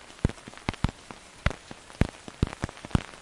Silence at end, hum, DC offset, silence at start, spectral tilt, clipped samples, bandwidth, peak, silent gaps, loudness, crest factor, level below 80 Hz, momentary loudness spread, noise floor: 0 s; none; under 0.1%; 0 s; -6 dB/octave; under 0.1%; 11.5 kHz; -4 dBFS; none; -33 LUFS; 28 dB; -38 dBFS; 12 LU; -47 dBFS